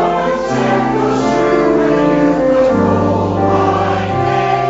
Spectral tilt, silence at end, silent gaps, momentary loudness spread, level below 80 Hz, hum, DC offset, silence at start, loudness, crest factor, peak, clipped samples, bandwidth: -7 dB/octave; 0 s; none; 3 LU; -38 dBFS; none; under 0.1%; 0 s; -13 LUFS; 12 dB; -2 dBFS; under 0.1%; 7.8 kHz